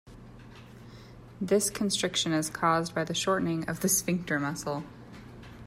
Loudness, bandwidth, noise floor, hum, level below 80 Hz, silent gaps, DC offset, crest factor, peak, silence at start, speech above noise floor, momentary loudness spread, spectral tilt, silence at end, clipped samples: -28 LUFS; 16 kHz; -49 dBFS; none; -58 dBFS; none; under 0.1%; 20 dB; -12 dBFS; 0.05 s; 20 dB; 23 LU; -3.5 dB/octave; 0 s; under 0.1%